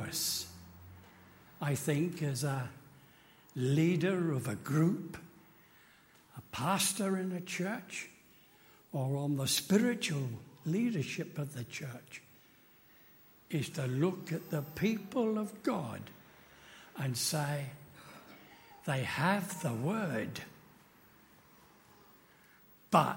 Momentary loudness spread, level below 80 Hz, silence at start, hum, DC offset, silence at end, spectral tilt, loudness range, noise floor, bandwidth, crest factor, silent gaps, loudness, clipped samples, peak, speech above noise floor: 22 LU; -72 dBFS; 0 s; none; under 0.1%; 0 s; -5 dB/octave; 5 LU; -63 dBFS; 16.5 kHz; 24 dB; none; -35 LUFS; under 0.1%; -12 dBFS; 29 dB